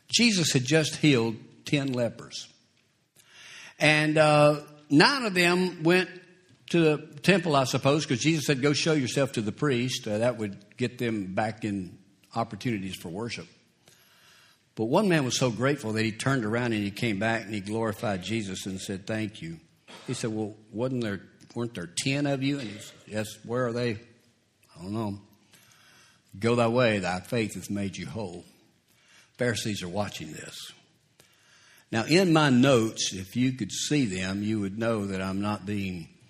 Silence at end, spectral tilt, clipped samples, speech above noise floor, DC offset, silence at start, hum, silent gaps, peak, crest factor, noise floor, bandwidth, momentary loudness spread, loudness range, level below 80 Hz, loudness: 0.25 s; -5 dB/octave; under 0.1%; 41 dB; under 0.1%; 0.1 s; none; none; -2 dBFS; 26 dB; -68 dBFS; 14 kHz; 16 LU; 10 LU; -64 dBFS; -27 LUFS